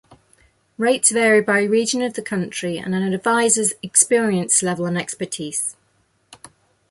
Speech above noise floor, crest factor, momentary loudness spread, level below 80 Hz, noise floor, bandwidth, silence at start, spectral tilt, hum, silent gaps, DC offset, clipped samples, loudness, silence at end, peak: 44 dB; 20 dB; 10 LU; -64 dBFS; -63 dBFS; 12 kHz; 0.8 s; -3 dB/octave; none; none; under 0.1%; under 0.1%; -18 LUFS; 0.55 s; 0 dBFS